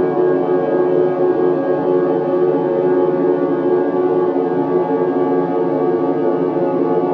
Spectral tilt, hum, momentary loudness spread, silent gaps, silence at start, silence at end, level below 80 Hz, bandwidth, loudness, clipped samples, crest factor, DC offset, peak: -10.5 dB/octave; none; 2 LU; none; 0 s; 0 s; -62 dBFS; 4.5 kHz; -16 LUFS; under 0.1%; 12 dB; under 0.1%; -4 dBFS